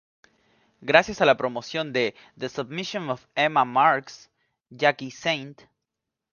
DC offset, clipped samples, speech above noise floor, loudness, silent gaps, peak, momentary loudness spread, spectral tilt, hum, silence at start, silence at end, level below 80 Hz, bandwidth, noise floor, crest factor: under 0.1%; under 0.1%; 61 dB; -24 LUFS; none; 0 dBFS; 13 LU; -4.5 dB/octave; none; 0.8 s; 0.8 s; -64 dBFS; 7.2 kHz; -85 dBFS; 26 dB